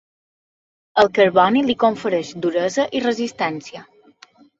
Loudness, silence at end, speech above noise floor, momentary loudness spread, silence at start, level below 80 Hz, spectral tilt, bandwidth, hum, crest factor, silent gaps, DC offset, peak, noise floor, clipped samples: -18 LUFS; 0.8 s; 32 dB; 10 LU; 0.95 s; -60 dBFS; -5 dB/octave; 8 kHz; none; 18 dB; none; under 0.1%; -2 dBFS; -50 dBFS; under 0.1%